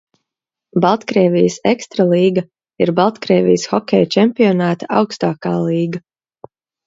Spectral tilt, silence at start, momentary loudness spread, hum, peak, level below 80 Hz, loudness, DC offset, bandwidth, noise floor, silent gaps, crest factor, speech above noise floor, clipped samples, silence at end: -6.5 dB/octave; 0.75 s; 7 LU; none; 0 dBFS; -60 dBFS; -15 LUFS; under 0.1%; 7.8 kHz; -84 dBFS; none; 16 dB; 70 dB; under 0.1%; 0.85 s